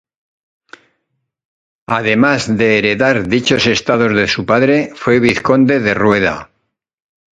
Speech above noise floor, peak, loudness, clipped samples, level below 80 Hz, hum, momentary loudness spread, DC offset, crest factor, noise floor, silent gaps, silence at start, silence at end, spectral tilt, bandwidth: 58 dB; 0 dBFS; -13 LUFS; under 0.1%; -46 dBFS; none; 3 LU; under 0.1%; 14 dB; -71 dBFS; none; 1.9 s; 0.95 s; -5 dB/octave; 10.5 kHz